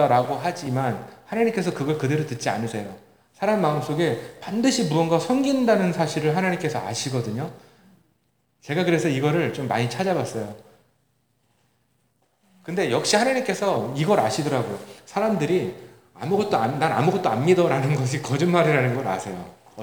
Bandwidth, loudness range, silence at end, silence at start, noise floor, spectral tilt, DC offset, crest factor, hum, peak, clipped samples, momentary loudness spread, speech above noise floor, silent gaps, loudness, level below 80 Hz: over 20 kHz; 5 LU; 0 s; 0 s; -69 dBFS; -5.5 dB/octave; 0.1%; 20 dB; none; -4 dBFS; under 0.1%; 12 LU; 46 dB; none; -23 LUFS; -66 dBFS